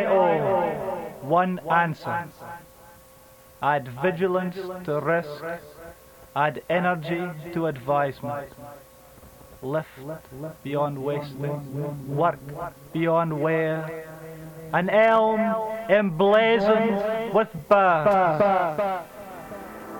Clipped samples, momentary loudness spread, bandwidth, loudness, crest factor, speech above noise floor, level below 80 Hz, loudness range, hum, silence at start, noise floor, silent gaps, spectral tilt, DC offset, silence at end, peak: under 0.1%; 19 LU; 18 kHz; -24 LUFS; 20 dB; 27 dB; -58 dBFS; 10 LU; none; 0 s; -51 dBFS; none; -7 dB/octave; under 0.1%; 0 s; -4 dBFS